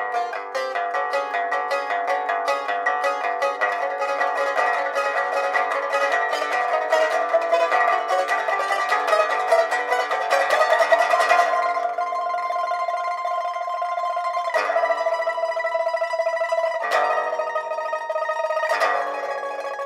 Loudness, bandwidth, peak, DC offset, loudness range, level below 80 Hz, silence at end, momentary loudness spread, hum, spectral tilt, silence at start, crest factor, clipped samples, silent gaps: -22 LUFS; 15 kHz; -4 dBFS; under 0.1%; 4 LU; -80 dBFS; 0 s; 7 LU; none; 0 dB/octave; 0 s; 18 dB; under 0.1%; none